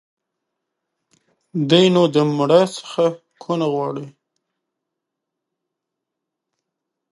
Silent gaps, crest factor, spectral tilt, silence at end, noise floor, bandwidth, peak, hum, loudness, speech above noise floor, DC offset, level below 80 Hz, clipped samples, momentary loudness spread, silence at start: none; 20 dB; -6 dB/octave; 3.05 s; -82 dBFS; 11.5 kHz; -2 dBFS; none; -18 LUFS; 65 dB; under 0.1%; -70 dBFS; under 0.1%; 14 LU; 1.55 s